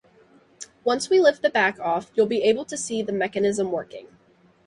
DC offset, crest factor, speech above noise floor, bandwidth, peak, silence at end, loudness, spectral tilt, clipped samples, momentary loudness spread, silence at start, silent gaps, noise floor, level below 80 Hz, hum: under 0.1%; 18 dB; 36 dB; 11.5 kHz; -6 dBFS; 0.6 s; -23 LUFS; -3.5 dB/octave; under 0.1%; 16 LU; 0.6 s; none; -58 dBFS; -66 dBFS; none